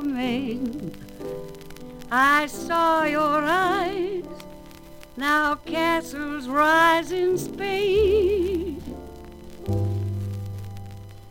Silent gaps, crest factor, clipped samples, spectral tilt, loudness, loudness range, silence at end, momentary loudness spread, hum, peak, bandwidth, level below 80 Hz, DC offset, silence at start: none; 18 dB; under 0.1%; -5.5 dB/octave; -23 LUFS; 4 LU; 0 s; 22 LU; none; -6 dBFS; 17 kHz; -46 dBFS; under 0.1%; 0 s